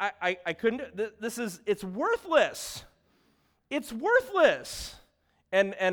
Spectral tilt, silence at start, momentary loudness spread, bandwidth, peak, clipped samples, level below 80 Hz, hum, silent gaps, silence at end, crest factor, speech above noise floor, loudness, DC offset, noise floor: -3.5 dB/octave; 0 s; 14 LU; over 20 kHz; -8 dBFS; under 0.1%; -60 dBFS; none; none; 0 s; 20 dB; 41 dB; -29 LUFS; under 0.1%; -69 dBFS